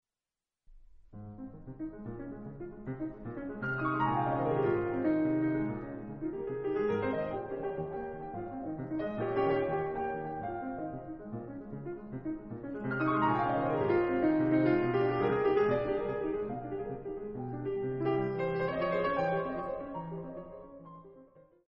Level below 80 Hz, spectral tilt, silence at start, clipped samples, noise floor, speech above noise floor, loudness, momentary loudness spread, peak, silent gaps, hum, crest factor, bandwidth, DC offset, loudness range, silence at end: -58 dBFS; -6.5 dB/octave; 0.7 s; under 0.1%; under -90 dBFS; over 49 dB; -33 LUFS; 15 LU; -18 dBFS; none; none; 16 dB; 5.6 kHz; under 0.1%; 8 LU; 0.25 s